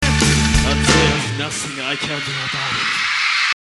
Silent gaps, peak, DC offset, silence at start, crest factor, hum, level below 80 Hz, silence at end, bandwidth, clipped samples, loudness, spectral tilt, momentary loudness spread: none; 0 dBFS; under 0.1%; 0 s; 18 dB; none; -26 dBFS; 0.1 s; 12.5 kHz; under 0.1%; -17 LUFS; -3.5 dB/octave; 8 LU